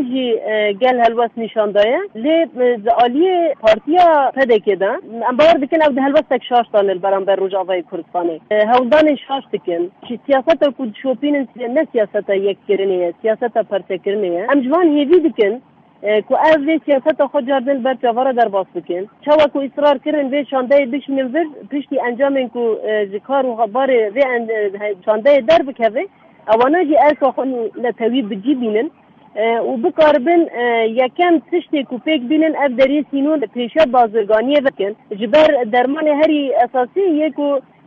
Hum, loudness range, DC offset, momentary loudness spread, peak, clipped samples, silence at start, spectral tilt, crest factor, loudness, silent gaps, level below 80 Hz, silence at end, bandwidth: none; 4 LU; under 0.1%; 9 LU; -2 dBFS; under 0.1%; 0 s; -6.5 dB/octave; 14 dB; -16 LUFS; none; -56 dBFS; 0.25 s; 7 kHz